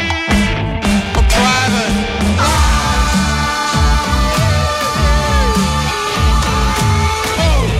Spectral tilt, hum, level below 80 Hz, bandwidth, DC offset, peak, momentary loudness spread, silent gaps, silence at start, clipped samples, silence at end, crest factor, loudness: -4.5 dB/octave; none; -18 dBFS; 15.5 kHz; under 0.1%; -2 dBFS; 3 LU; none; 0 s; under 0.1%; 0 s; 12 dB; -14 LUFS